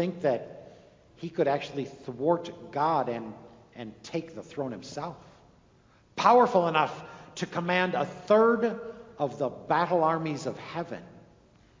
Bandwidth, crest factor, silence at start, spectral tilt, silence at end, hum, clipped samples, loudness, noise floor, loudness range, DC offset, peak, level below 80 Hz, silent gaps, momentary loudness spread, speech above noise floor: 7.6 kHz; 24 dB; 0 s; -6 dB/octave; 0.6 s; none; under 0.1%; -28 LUFS; -61 dBFS; 8 LU; under 0.1%; -6 dBFS; -66 dBFS; none; 21 LU; 33 dB